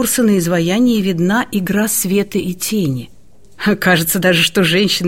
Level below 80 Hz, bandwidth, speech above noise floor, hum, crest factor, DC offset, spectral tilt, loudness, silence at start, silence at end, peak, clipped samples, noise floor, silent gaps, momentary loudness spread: -46 dBFS; 16.5 kHz; 20 dB; none; 14 dB; 0.8%; -4 dB/octave; -14 LUFS; 0 s; 0 s; -2 dBFS; under 0.1%; -35 dBFS; none; 7 LU